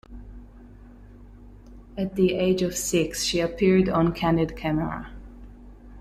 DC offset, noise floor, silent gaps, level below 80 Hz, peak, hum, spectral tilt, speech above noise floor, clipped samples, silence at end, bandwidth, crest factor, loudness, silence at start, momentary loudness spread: under 0.1%; -46 dBFS; none; -44 dBFS; -8 dBFS; none; -5 dB/octave; 23 dB; under 0.1%; 0 s; 15.5 kHz; 18 dB; -24 LUFS; 0.1 s; 20 LU